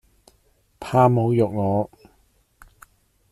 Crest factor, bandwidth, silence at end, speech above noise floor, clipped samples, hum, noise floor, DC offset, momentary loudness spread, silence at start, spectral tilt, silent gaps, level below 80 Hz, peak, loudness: 20 dB; 13.5 kHz; 1.45 s; 43 dB; under 0.1%; none; -62 dBFS; under 0.1%; 14 LU; 0.8 s; -9 dB/octave; none; -56 dBFS; -4 dBFS; -20 LUFS